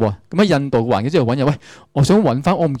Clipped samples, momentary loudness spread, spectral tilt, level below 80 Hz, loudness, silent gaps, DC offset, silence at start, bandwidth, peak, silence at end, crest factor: under 0.1%; 6 LU; -7 dB/octave; -46 dBFS; -17 LUFS; none; under 0.1%; 0 s; 14 kHz; -6 dBFS; 0 s; 10 dB